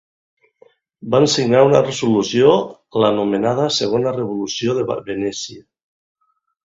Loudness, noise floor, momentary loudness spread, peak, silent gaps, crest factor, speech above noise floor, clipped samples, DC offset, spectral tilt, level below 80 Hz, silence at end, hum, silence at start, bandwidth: -17 LUFS; -54 dBFS; 10 LU; 0 dBFS; none; 18 dB; 37 dB; under 0.1%; under 0.1%; -5 dB/octave; -56 dBFS; 1.15 s; none; 1.05 s; 7.8 kHz